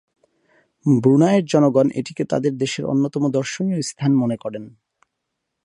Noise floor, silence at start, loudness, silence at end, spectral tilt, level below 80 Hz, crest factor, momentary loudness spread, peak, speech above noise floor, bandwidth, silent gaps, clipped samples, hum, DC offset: -78 dBFS; 0.85 s; -19 LUFS; 0.95 s; -6.5 dB/octave; -64 dBFS; 16 dB; 11 LU; -4 dBFS; 59 dB; 11 kHz; none; under 0.1%; none; under 0.1%